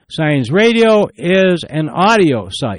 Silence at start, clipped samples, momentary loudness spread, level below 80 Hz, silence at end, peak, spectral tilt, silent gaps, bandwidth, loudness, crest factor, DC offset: 0.1 s; under 0.1%; 7 LU; -50 dBFS; 0 s; -2 dBFS; -6 dB/octave; none; 11.5 kHz; -13 LUFS; 12 dB; under 0.1%